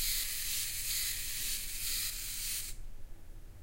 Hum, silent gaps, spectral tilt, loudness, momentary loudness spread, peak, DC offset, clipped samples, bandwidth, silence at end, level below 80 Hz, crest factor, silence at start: none; none; 1 dB/octave; -34 LUFS; 7 LU; -20 dBFS; under 0.1%; under 0.1%; 16 kHz; 0 s; -46 dBFS; 16 dB; 0 s